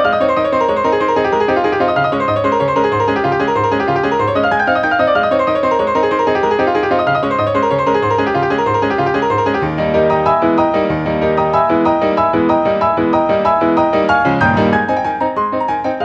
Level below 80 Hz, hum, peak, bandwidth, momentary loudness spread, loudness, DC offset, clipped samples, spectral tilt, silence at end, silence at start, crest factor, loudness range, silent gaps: -42 dBFS; none; 0 dBFS; 8.4 kHz; 2 LU; -14 LUFS; under 0.1%; under 0.1%; -7 dB/octave; 0 s; 0 s; 14 dB; 1 LU; none